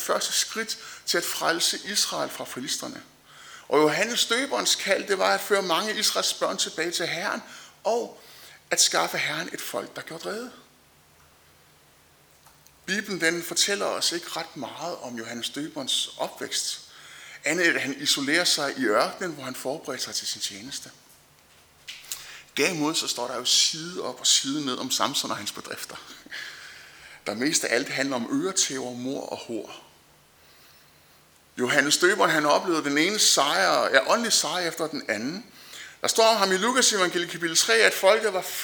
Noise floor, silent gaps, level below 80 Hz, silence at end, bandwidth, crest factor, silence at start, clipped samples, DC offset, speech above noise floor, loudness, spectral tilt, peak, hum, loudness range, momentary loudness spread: -57 dBFS; none; -72 dBFS; 0 s; over 20 kHz; 24 dB; 0 s; under 0.1%; under 0.1%; 32 dB; -24 LUFS; -1.5 dB/octave; -2 dBFS; none; 9 LU; 17 LU